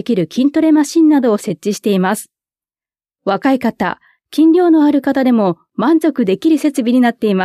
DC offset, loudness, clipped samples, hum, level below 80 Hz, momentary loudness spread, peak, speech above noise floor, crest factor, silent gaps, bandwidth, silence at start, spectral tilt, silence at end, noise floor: under 0.1%; -14 LUFS; under 0.1%; none; -60 dBFS; 9 LU; -2 dBFS; over 77 dB; 12 dB; none; 14 kHz; 0.05 s; -6 dB/octave; 0 s; under -90 dBFS